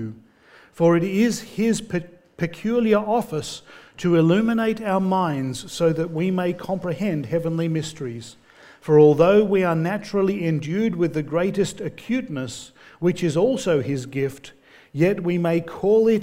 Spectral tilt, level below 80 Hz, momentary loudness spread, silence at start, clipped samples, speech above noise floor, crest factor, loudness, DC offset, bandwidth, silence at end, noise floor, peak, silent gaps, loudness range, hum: -6.5 dB/octave; -56 dBFS; 12 LU; 0 s; under 0.1%; 31 dB; 18 dB; -21 LUFS; under 0.1%; 16 kHz; 0 s; -52 dBFS; -4 dBFS; none; 5 LU; none